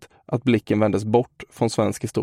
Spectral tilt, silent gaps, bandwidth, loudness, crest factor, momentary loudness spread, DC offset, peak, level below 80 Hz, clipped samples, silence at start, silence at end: -6.5 dB/octave; none; 16 kHz; -22 LUFS; 18 dB; 7 LU; under 0.1%; -4 dBFS; -58 dBFS; under 0.1%; 0 s; 0 s